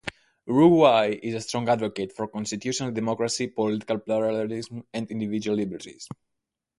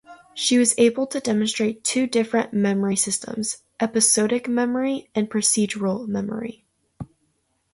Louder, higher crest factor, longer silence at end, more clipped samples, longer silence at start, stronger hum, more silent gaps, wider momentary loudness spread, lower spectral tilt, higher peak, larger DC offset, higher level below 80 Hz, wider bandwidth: second, -25 LUFS vs -21 LUFS; about the same, 20 dB vs 18 dB; about the same, 0.75 s vs 0.7 s; neither; about the same, 0.05 s vs 0.1 s; neither; neither; first, 19 LU vs 13 LU; first, -5.5 dB/octave vs -3.5 dB/octave; about the same, -4 dBFS vs -4 dBFS; neither; about the same, -62 dBFS vs -62 dBFS; about the same, 11.5 kHz vs 12 kHz